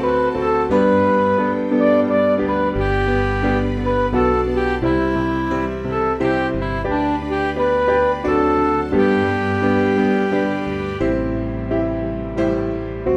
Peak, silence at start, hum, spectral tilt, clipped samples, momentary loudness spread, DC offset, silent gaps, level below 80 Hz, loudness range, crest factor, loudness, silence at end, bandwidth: -4 dBFS; 0 s; none; -8 dB/octave; under 0.1%; 6 LU; under 0.1%; none; -32 dBFS; 3 LU; 14 dB; -19 LUFS; 0 s; 9.2 kHz